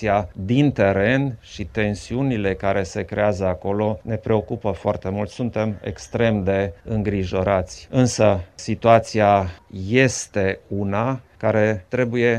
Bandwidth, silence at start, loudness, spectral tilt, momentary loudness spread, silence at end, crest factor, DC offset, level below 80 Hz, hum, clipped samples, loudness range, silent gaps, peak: 11 kHz; 0 s; -21 LUFS; -6 dB/octave; 9 LU; 0 s; 20 dB; under 0.1%; -46 dBFS; none; under 0.1%; 4 LU; none; 0 dBFS